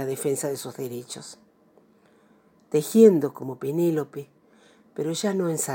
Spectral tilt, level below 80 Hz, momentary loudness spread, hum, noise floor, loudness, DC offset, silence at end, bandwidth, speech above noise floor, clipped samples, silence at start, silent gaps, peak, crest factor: -5.5 dB/octave; -80 dBFS; 22 LU; none; -59 dBFS; -24 LUFS; under 0.1%; 0 s; 17 kHz; 35 dB; under 0.1%; 0 s; none; -4 dBFS; 22 dB